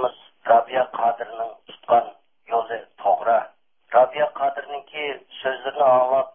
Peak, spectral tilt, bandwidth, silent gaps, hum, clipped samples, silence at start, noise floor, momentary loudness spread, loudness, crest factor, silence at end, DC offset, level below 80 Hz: -4 dBFS; -8 dB/octave; 3.6 kHz; none; none; under 0.1%; 0 s; -45 dBFS; 14 LU; -22 LUFS; 18 dB; 0.05 s; under 0.1%; -76 dBFS